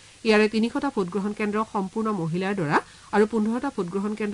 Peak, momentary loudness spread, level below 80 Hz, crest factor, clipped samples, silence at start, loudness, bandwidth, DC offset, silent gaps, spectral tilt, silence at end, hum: -10 dBFS; 7 LU; -58 dBFS; 16 dB; under 0.1%; 0.25 s; -25 LUFS; 11 kHz; under 0.1%; none; -6 dB/octave; 0 s; none